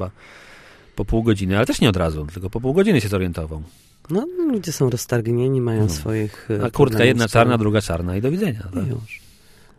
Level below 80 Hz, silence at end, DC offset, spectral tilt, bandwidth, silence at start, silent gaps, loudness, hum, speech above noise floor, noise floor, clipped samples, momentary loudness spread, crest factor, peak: -38 dBFS; 0.6 s; under 0.1%; -6 dB/octave; 15 kHz; 0 s; none; -20 LUFS; none; 29 dB; -49 dBFS; under 0.1%; 13 LU; 20 dB; -2 dBFS